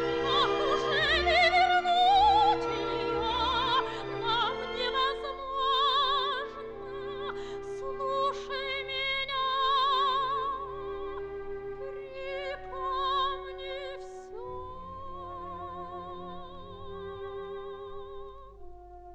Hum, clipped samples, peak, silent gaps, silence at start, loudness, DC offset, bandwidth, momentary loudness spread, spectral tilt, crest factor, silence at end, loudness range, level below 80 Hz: none; under 0.1%; -14 dBFS; none; 0 s; -28 LUFS; under 0.1%; 9 kHz; 18 LU; -4 dB/octave; 16 dB; 0 s; 16 LU; -50 dBFS